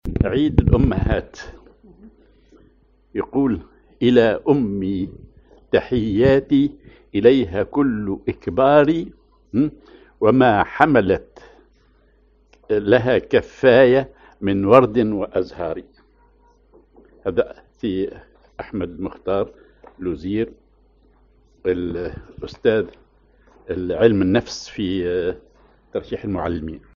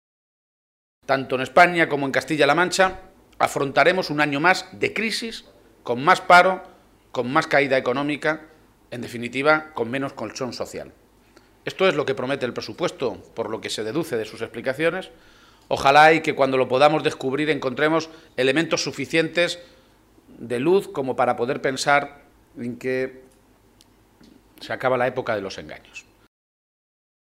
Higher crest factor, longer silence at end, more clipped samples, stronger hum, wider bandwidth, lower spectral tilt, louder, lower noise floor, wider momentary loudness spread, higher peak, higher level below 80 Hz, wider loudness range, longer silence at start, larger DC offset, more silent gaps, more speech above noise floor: about the same, 20 dB vs 20 dB; second, 0.2 s vs 1.25 s; neither; neither; second, 7.2 kHz vs 16 kHz; first, -6 dB/octave vs -4.5 dB/octave; about the same, -19 LUFS vs -21 LUFS; about the same, -56 dBFS vs -56 dBFS; about the same, 15 LU vs 17 LU; about the same, 0 dBFS vs -2 dBFS; first, -36 dBFS vs -58 dBFS; about the same, 10 LU vs 8 LU; second, 0.05 s vs 1.1 s; neither; neither; about the same, 38 dB vs 35 dB